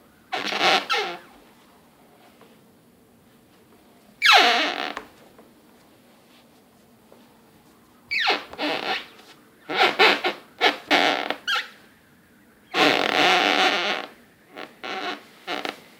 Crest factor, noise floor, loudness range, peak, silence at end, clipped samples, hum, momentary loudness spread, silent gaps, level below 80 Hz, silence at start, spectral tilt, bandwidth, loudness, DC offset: 24 dB; -55 dBFS; 8 LU; 0 dBFS; 0.25 s; under 0.1%; none; 17 LU; none; -74 dBFS; 0.3 s; -1.5 dB/octave; 18 kHz; -21 LUFS; under 0.1%